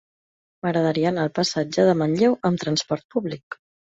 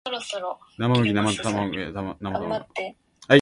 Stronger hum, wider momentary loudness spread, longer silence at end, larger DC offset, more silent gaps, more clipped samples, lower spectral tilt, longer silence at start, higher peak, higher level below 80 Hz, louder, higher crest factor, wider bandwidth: neither; about the same, 12 LU vs 12 LU; first, 0.45 s vs 0 s; neither; first, 3.04-3.09 s, 3.43-3.51 s vs none; neither; about the same, -5.5 dB/octave vs -5.5 dB/octave; first, 0.65 s vs 0.05 s; second, -6 dBFS vs 0 dBFS; second, -62 dBFS vs -52 dBFS; first, -22 LUFS vs -25 LUFS; second, 16 dB vs 24 dB; second, 8.2 kHz vs 11.5 kHz